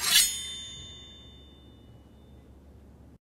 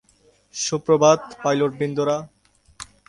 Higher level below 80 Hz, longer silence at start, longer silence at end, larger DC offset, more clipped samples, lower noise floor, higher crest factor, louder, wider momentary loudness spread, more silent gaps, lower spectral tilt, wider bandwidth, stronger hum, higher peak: about the same, -56 dBFS vs -60 dBFS; second, 0 s vs 0.55 s; first, 0.5 s vs 0.25 s; neither; neither; second, -52 dBFS vs -59 dBFS; first, 26 dB vs 20 dB; second, -26 LUFS vs -21 LUFS; first, 28 LU vs 19 LU; neither; second, 1 dB/octave vs -4.5 dB/octave; first, 16 kHz vs 11.5 kHz; neither; second, -6 dBFS vs -2 dBFS